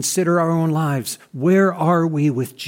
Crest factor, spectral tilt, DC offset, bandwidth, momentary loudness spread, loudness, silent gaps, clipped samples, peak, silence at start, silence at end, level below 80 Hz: 14 dB; -5.5 dB/octave; under 0.1%; 17 kHz; 6 LU; -18 LUFS; none; under 0.1%; -4 dBFS; 0 s; 0 s; -66 dBFS